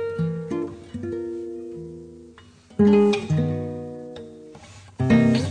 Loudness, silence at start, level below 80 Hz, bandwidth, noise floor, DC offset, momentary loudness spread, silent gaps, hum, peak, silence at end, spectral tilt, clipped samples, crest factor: -23 LUFS; 0 s; -54 dBFS; 9.8 kHz; -49 dBFS; under 0.1%; 24 LU; none; none; -8 dBFS; 0 s; -7.5 dB/octave; under 0.1%; 16 dB